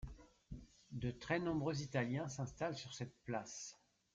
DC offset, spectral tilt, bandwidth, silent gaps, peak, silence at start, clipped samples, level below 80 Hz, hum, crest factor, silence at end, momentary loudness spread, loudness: under 0.1%; -5.5 dB/octave; 9 kHz; none; -24 dBFS; 0 s; under 0.1%; -62 dBFS; none; 20 dB; 0.4 s; 17 LU; -43 LUFS